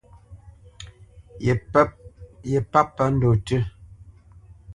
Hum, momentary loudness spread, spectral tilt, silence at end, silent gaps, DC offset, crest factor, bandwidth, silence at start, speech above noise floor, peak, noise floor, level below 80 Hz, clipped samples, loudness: none; 23 LU; -7.5 dB/octave; 0 s; none; under 0.1%; 22 dB; 11 kHz; 0.3 s; 28 dB; -2 dBFS; -49 dBFS; -44 dBFS; under 0.1%; -22 LUFS